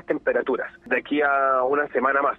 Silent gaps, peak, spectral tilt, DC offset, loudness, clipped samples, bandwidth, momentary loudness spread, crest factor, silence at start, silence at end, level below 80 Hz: none; -8 dBFS; -7 dB/octave; under 0.1%; -22 LUFS; under 0.1%; 4.7 kHz; 6 LU; 14 dB; 0.1 s; 0 s; -60 dBFS